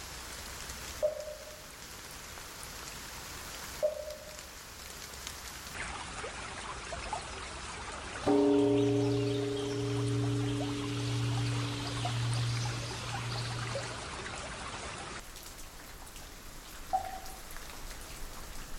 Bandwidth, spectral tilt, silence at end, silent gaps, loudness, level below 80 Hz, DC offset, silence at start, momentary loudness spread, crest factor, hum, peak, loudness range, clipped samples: 17 kHz; -5 dB/octave; 0 s; none; -36 LUFS; -52 dBFS; under 0.1%; 0 s; 15 LU; 20 dB; none; -16 dBFS; 11 LU; under 0.1%